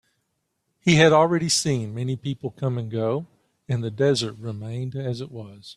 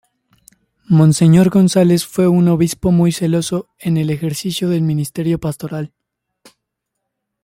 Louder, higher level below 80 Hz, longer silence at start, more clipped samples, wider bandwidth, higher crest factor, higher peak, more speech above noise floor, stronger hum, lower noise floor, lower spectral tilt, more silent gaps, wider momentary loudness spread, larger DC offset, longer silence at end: second, -23 LUFS vs -15 LUFS; second, -58 dBFS vs -46 dBFS; about the same, 0.85 s vs 0.9 s; neither; second, 13 kHz vs 16 kHz; first, 20 dB vs 14 dB; about the same, -4 dBFS vs -2 dBFS; second, 52 dB vs 63 dB; neither; about the same, -75 dBFS vs -77 dBFS; second, -5 dB/octave vs -6.5 dB/octave; neither; first, 15 LU vs 12 LU; neither; second, 0.05 s vs 1.55 s